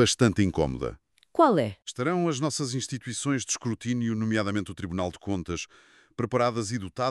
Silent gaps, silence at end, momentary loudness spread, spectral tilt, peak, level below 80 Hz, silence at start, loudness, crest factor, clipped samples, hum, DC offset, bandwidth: none; 0 s; 12 LU; -5 dB/octave; -8 dBFS; -52 dBFS; 0 s; -28 LUFS; 20 dB; under 0.1%; none; under 0.1%; 12.5 kHz